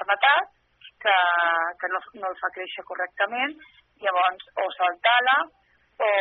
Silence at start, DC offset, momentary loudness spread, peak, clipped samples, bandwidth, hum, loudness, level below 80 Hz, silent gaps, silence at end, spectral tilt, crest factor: 0 s; under 0.1%; 12 LU; -8 dBFS; under 0.1%; 4.2 kHz; none; -23 LUFS; -76 dBFS; none; 0 s; 4 dB/octave; 18 dB